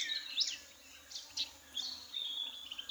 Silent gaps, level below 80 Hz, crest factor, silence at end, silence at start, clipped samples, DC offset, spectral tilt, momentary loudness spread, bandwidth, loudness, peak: none; -76 dBFS; 22 dB; 0 s; 0 s; under 0.1%; under 0.1%; 2 dB/octave; 13 LU; over 20 kHz; -39 LUFS; -20 dBFS